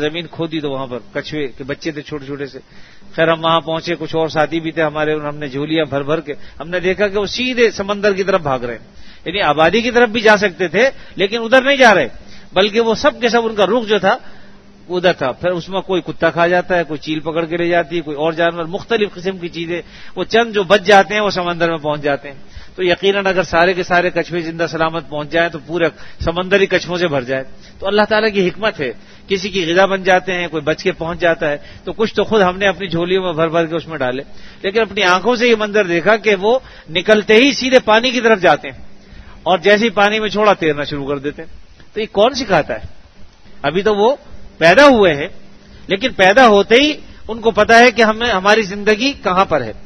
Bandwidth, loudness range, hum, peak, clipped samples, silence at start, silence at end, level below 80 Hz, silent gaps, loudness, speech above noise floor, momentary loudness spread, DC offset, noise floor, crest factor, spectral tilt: 12 kHz; 6 LU; none; 0 dBFS; 0.1%; 0 s; 0 s; -42 dBFS; none; -15 LUFS; 23 dB; 14 LU; under 0.1%; -38 dBFS; 16 dB; -4.5 dB/octave